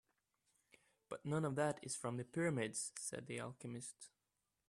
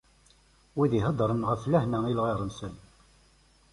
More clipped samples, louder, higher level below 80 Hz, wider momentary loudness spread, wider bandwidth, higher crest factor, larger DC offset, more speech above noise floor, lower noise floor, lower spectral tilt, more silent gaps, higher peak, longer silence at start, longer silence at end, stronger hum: neither; second, -43 LUFS vs -28 LUFS; second, -80 dBFS vs -54 dBFS; about the same, 13 LU vs 12 LU; first, 14 kHz vs 11.5 kHz; about the same, 20 dB vs 18 dB; neither; first, 45 dB vs 34 dB; first, -89 dBFS vs -62 dBFS; second, -5 dB/octave vs -8 dB/octave; neither; second, -26 dBFS vs -12 dBFS; first, 1.1 s vs 0.75 s; second, 0.6 s vs 0.95 s; neither